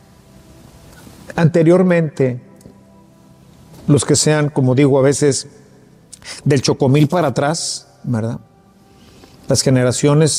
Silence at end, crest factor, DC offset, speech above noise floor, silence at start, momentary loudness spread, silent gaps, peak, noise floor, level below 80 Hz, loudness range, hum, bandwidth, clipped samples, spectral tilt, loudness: 0 s; 16 dB; under 0.1%; 34 dB; 1.3 s; 14 LU; none; 0 dBFS; -48 dBFS; -52 dBFS; 3 LU; none; 15 kHz; under 0.1%; -5.5 dB/octave; -15 LUFS